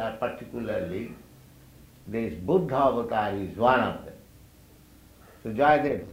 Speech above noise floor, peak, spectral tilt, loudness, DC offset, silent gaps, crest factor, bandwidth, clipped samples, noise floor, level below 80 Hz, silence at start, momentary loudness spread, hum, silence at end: 28 dB; -8 dBFS; -7 dB/octave; -26 LUFS; under 0.1%; none; 20 dB; 16 kHz; under 0.1%; -54 dBFS; -54 dBFS; 0 s; 15 LU; none; 0 s